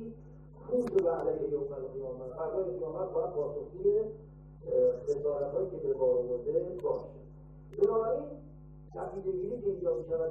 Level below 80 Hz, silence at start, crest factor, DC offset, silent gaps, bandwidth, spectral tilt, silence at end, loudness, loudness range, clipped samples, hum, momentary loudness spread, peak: -56 dBFS; 0 s; 16 dB; under 0.1%; none; 7.2 kHz; -9.5 dB/octave; 0 s; -33 LUFS; 3 LU; under 0.1%; none; 20 LU; -16 dBFS